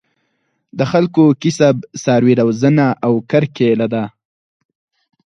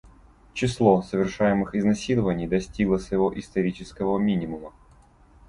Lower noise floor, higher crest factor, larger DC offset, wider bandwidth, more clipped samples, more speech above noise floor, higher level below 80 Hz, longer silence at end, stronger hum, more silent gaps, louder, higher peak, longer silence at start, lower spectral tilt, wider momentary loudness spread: first, -67 dBFS vs -54 dBFS; about the same, 16 dB vs 20 dB; neither; about the same, 10.5 kHz vs 11 kHz; neither; first, 54 dB vs 31 dB; second, -58 dBFS vs -46 dBFS; first, 1.2 s vs 0.8 s; neither; neither; first, -14 LUFS vs -24 LUFS; first, 0 dBFS vs -6 dBFS; first, 0.75 s vs 0.55 s; about the same, -7 dB/octave vs -7 dB/octave; about the same, 8 LU vs 9 LU